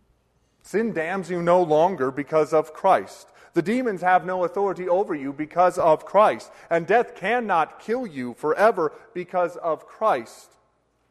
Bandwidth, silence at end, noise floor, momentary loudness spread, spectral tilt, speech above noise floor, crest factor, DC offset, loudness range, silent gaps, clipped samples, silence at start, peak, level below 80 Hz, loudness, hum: 13.5 kHz; 0.75 s; -67 dBFS; 9 LU; -6 dB/octave; 44 dB; 18 dB; under 0.1%; 3 LU; none; under 0.1%; 0.7 s; -6 dBFS; -64 dBFS; -23 LUFS; none